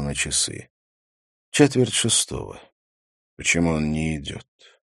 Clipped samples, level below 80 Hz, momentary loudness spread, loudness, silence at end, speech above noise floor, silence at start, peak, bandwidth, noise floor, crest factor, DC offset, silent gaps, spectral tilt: under 0.1%; -44 dBFS; 17 LU; -21 LUFS; 0.4 s; over 67 dB; 0 s; -2 dBFS; 13 kHz; under -90 dBFS; 24 dB; under 0.1%; 0.70-1.52 s, 2.72-3.37 s; -3.5 dB/octave